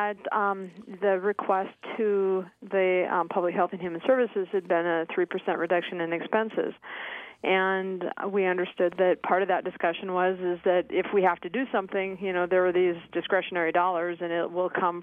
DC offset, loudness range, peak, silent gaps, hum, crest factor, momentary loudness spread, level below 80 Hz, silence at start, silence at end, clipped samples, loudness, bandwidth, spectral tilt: under 0.1%; 2 LU; -10 dBFS; none; none; 18 dB; 6 LU; -72 dBFS; 0 s; 0 s; under 0.1%; -27 LUFS; 3.8 kHz; -8 dB/octave